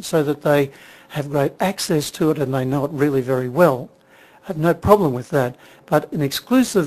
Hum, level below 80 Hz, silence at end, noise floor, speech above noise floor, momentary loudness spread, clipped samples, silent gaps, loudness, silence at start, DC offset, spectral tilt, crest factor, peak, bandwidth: none; -50 dBFS; 0 s; -49 dBFS; 30 dB; 10 LU; under 0.1%; none; -19 LUFS; 0 s; under 0.1%; -6 dB/octave; 20 dB; 0 dBFS; 14 kHz